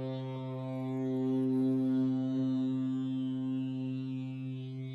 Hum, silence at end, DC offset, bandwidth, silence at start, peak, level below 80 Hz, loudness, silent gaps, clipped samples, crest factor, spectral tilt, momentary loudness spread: none; 0 s; under 0.1%; 4.6 kHz; 0 s; -24 dBFS; -74 dBFS; -34 LUFS; none; under 0.1%; 10 dB; -9.5 dB/octave; 9 LU